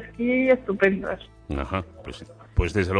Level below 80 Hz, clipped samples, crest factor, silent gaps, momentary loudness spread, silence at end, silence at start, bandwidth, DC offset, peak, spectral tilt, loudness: -36 dBFS; under 0.1%; 18 dB; none; 19 LU; 0 s; 0 s; 10.5 kHz; under 0.1%; -6 dBFS; -7 dB/octave; -24 LUFS